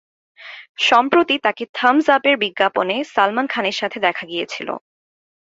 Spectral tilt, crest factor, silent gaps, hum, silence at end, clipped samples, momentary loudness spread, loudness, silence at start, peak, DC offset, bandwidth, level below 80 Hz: -3.5 dB/octave; 18 dB; 0.69-0.75 s, 1.69-1.74 s; none; 0.65 s; under 0.1%; 14 LU; -18 LUFS; 0.4 s; -2 dBFS; under 0.1%; 7.8 kHz; -66 dBFS